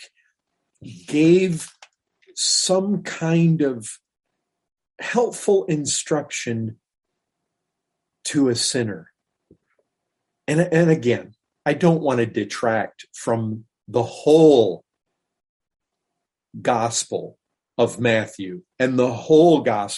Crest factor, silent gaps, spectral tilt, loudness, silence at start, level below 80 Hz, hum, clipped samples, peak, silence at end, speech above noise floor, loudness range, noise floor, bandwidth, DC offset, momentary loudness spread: 18 dB; 15.49-15.60 s; -5 dB/octave; -20 LUFS; 0 s; -66 dBFS; none; under 0.1%; -4 dBFS; 0 s; 62 dB; 6 LU; -82 dBFS; 11.5 kHz; under 0.1%; 16 LU